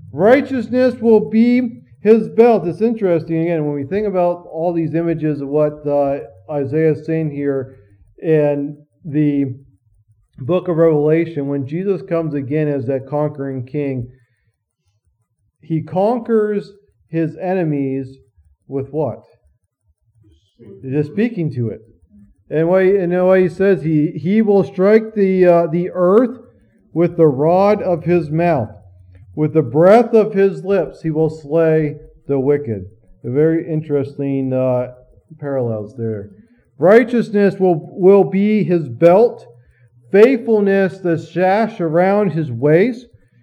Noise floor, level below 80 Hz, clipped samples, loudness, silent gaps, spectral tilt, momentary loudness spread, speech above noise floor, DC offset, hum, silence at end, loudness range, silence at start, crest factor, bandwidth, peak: -67 dBFS; -56 dBFS; under 0.1%; -16 LUFS; none; -9.5 dB/octave; 12 LU; 52 dB; under 0.1%; none; 0.4 s; 9 LU; 0.05 s; 16 dB; 8.6 kHz; 0 dBFS